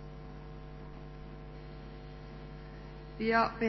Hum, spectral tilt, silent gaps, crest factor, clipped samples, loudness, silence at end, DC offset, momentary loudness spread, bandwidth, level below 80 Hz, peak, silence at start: none; -4 dB/octave; none; 24 dB; under 0.1%; -39 LUFS; 0 s; under 0.1%; 18 LU; 6 kHz; -50 dBFS; -14 dBFS; 0 s